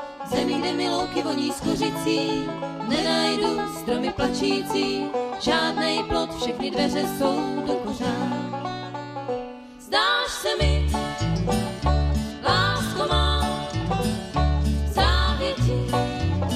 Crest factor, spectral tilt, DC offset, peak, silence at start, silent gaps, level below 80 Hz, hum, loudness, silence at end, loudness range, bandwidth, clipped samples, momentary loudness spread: 16 dB; -5 dB/octave; under 0.1%; -8 dBFS; 0 s; none; -32 dBFS; none; -24 LUFS; 0 s; 3 LU; 15 kHz; under 0.1%; 7 LU